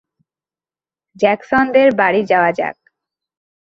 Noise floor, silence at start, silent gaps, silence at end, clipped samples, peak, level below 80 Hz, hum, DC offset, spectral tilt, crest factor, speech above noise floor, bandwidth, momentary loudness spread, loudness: under -90 dBFS; 1.2 s; none; 0.9 s; under 0.1%; -2 dBFS; -56 dBFS; none; under 0.1%; -6.5 dB/octave; 16 dB; over 76 dB; 7.2 kHz; 8 LU; -15 LUFS